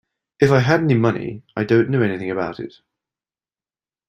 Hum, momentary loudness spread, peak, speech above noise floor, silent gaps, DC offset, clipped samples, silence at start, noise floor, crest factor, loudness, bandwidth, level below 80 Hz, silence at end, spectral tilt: none; 13 LU; -2 dBFS; over 72 dB; none; under 0.1%; under 0.1%; 0.4 s; under -90 dBFS; 18 dB; -19 LUFS; 9 kHz; -56 dBFS; 1.4 s; -7.5 dB/octave